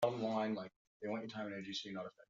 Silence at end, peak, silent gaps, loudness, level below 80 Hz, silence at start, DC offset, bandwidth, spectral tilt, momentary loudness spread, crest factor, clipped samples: 0.05 s; -22 dBFS; 0.76-1.00 s; -42 LUFS; -84 dBFS; 0 s; under 0.1%; 7.4 kHz; -4 dB/octave; 10 LU; 20 dB; under 0.1%